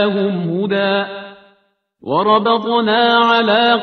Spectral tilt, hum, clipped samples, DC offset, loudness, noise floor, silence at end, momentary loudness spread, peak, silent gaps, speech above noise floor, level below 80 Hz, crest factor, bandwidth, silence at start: -7 dB/octave; none; under 0.1%; under 0.1%; -14 LUFS; -60 dBFS; 0 s; 9 LU; 0 dBFS; none; 45 dB; -62 dBFS; 14 dB; 6.4 kHz; 0 s